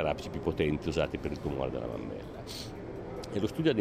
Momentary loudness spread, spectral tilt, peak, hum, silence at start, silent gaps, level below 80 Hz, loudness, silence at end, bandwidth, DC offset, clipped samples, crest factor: 11 LU; -6.5 dB/octave; -16 dBFS; none; 0 s; none; -48 dBFS; -34 LUFS; 0 s; 16 kHz; under 0.1%; under 0.1%; 18 dB